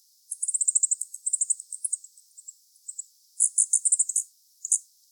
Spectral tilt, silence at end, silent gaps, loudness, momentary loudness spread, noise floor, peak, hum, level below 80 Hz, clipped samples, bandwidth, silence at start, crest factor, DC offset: 10 dB/octave; 0.3 s; none; -24 LUFS; 19 LU; -52 dBFS; -8 dBFS; none; under -90 dBFS; under 0.1%; 19 kHz; 0.3 s; 22 dB; under 0.1%